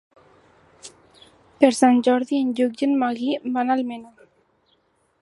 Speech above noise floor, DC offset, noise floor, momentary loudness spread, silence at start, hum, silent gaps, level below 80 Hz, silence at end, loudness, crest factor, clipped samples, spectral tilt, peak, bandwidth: 45 dB; under 0.1%; -65 dBFS; 8 LU; 0.85 s; none; none; -72 dBFS; 1.15 s; -21 LUFS; 22 dB; under 0.1%; -4 dB/octave; 0 dBFS; 11.5 kHz